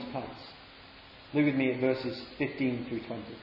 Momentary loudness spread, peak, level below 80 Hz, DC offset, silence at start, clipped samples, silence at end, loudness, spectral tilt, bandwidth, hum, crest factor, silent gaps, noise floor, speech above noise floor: 22 LU; -16 dBFS; -64 dBFS; under 0.1%; 0 s; under 0.1%; 0 s; -32 LUFS; -8.5 dB/octave; 5.8 kHz; none; 18 dB; none; -52 dBFS; 21 dB